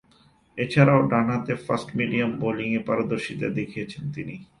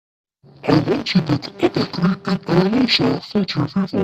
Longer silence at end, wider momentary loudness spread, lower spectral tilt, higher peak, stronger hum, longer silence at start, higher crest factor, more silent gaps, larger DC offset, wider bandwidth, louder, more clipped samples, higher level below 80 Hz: first, 0.15 s vs 0 s; first, 15 LU vs 6 LU; about the same, -7.5 dB/octave vs -6.5 dB/octave; about the same, -4 dBFS vs -2 dBFS; neither; about the same, 0.55 s vs 0.65 s; about the same, 20 dB vs 18 dB; neither; neither; first, 11 kHz vs 8.4 kHz; second, -24 LUFS vs -19 LUFS; neither; second, -58 dBFS vs -52 dBFS